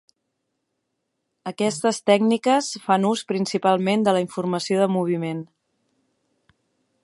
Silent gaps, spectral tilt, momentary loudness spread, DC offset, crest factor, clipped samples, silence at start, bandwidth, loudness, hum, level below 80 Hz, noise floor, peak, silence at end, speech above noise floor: none; -5 dB/octave; 7 LU; under 0.1%; 20 dB; under 0.1%; 1.45 s; 11.5 kHz; -21 LUFS; none; -74 dBFS; -77 dBFS; -2 dBFS; 1.6 s; 56 dB